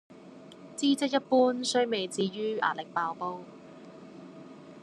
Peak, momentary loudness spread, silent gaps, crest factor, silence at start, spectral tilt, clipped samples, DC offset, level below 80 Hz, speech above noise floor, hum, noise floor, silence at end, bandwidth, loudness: -12 dBFS; 24 LU; none; 18 dB; 0.1 s; -4 dB/octave; under 0.1%; under 0.1%; -82 dBFS; 21 dB; none; -50 dBFS; 0 s; 12.5 kHz; -29 LUFS